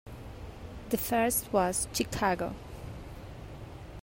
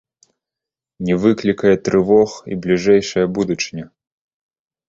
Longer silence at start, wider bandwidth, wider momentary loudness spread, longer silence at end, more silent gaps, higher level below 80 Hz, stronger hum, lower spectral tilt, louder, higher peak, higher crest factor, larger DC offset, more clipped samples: second, 0.05 s vs 1 s; first, 16 kHz vs 7.8 kHz; first, 18 LU vs 11 LU; second, 0 s vs 1.05 s; neither; about the same, -48 dBFS vs -50 dBFS; neither; second, -4 dB/octave vs -6 dB/octave; second, -30 LUFS vs -17 LUFS; second, -14 dBFS vs -2 dBFS; about the same, 20 dB vs 16 dB; neither; neither